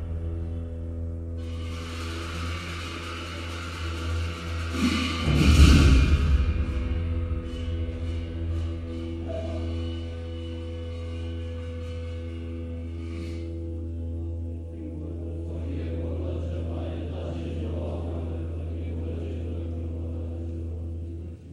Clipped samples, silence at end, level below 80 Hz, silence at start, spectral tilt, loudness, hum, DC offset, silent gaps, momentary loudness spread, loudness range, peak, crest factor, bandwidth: under 0.1%; 0 s; -30 dBFS; 0 s; -6 dB/octave; -29 LUFS; none; under 0.1%; none; 11 LU; 12 LU; -4 dBFS; 22 dB; 12.5 kHz